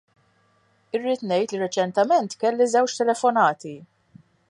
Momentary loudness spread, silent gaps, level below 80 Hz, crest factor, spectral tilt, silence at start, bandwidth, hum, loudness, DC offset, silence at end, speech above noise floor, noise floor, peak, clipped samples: 11 LU; none; -76 dBFS; 18 dB; -4 dB/octave; 0.95 s; 11.5 kHz; none; -22 LUFS; under 0.1%; 0.65 s; 42 dB; -63 dBFS; -6 dBFS; under 0.1%